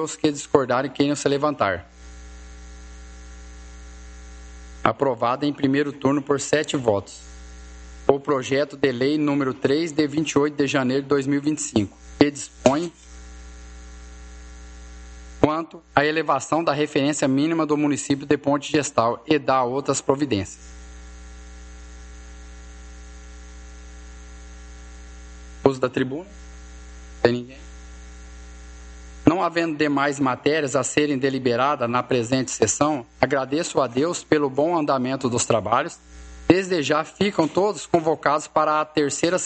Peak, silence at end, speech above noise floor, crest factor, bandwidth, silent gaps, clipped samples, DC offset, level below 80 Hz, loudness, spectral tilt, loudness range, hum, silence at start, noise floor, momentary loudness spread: 0 dBFS; 0 s; 19 dB; 24 dB; 9 kHz; none; under 0.1%; under 0.1%; -44 dBFS; -22 LUFS; -4.5 dB/octave; 9 LU; none; 0 s; -40 dBFS; 22 LU